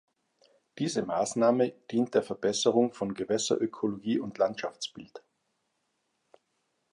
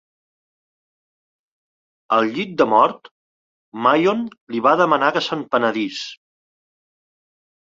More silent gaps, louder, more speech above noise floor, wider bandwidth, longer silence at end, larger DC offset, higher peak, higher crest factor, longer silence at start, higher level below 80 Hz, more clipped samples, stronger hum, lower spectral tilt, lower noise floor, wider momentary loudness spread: second, none vs 3.11-3.72 s, 4.41-4.47 s; second, -29 LUFS vs -18 LUFS; second, 49 dB vs over 72 dB; first, 11 kHz vs 7.6 kHz; first, 1.75 s vs 1.6 s; neither; second, -10 dBFS vs -2 dBFS; about the same, 20 dB vs 20 dB; second, 0.75 s vs 2.1 s; second, -72 dBFS vs -66 dBFS; neither; neither; about the same, -4.5 dB/octave vs -5 dB/octave; second, -78 dBFS vs under -90 dBFS; about the same, 11 LU vs 11 LU